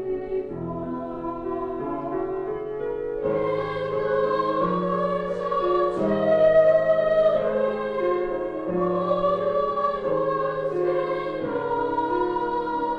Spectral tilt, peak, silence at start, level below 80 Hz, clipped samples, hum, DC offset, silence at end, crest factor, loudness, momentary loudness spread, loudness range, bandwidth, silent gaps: -8.5 dB/octave; -8 dBFS; 0 s; -50 dBFS; under 0.1%; none; under 0.1%; 0 s; 16 dB; -24 LUFS; 10 LU; 7 LU; 6.2 kHz; none